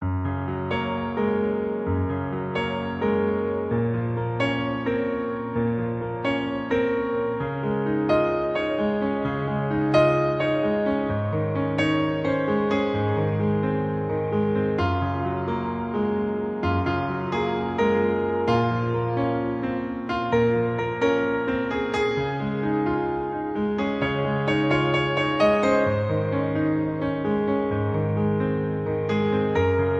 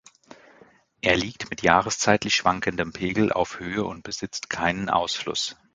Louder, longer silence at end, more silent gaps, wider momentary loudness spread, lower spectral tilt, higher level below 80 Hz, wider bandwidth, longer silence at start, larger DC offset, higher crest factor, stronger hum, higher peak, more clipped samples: about the same, -24 LUFS vs -24 LUFS; second, 0 s vs 0.2 s; neither; second, 6 LU vs 10 LU; first, -8 dB/octave vs -3.5 dB/octave; first, -44 dBFS vs -50 dBFS; second, 8.6 kHz vs 9.6 kHz; second, 0 s vs 1.05 s; neither; second, 18 dB vs 24 dB; neither; second, -6 dBFS vs 0 dBFS; neither